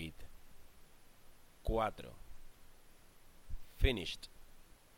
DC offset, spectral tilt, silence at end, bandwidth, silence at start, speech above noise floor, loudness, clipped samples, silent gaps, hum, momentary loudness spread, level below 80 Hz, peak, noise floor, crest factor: under 0.1%; -5.5 dB/octave; 0.2 s; 16.5 kHz; 0 s; 23 dB; -39 LUFS; under 0.1%; none; none; 26 LU; -46 dBFS; -16 dBFS; -59 dBFS; 26 dB